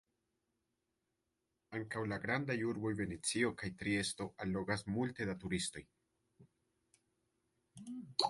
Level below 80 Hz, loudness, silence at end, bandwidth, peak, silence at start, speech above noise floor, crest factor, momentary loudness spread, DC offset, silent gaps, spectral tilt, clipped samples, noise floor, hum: -66 dBFS; -39 LUFS; 0 s; 11.5 kHz; -14 dBFS; 1.7 s; 47 dB; 26 dB; 10 LU; under 0.1%; none; -4 dB/octave; under 0.1%; -87 dBFS; none